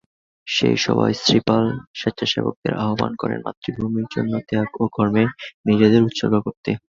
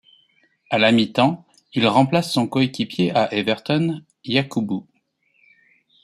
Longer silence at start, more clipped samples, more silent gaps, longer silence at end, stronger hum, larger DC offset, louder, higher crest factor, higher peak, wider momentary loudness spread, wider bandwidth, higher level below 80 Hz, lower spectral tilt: second, 0.45 s vs 0.7 s; neither; first, 1.87-1.94 s, 2.56-2.62 s, 3.57-3.62 s, 5.54-5.64 s, 6.57-6.63 s vs none; second, 0.15 s vs 1.2 s; neither; neither; about the same, -20 LUFS vs -20 LUFS; about the same, 18 dB vs 20 dB; about the same, -2 dBFS vs -2 dBFS; about the same, 10 LU vs 10 LU; second, 7.6 kHz vs 14 kHz; first, -52 dBFS vs -62 dBFS; about the same, -5.5 dB/octave vs -6 dB/octave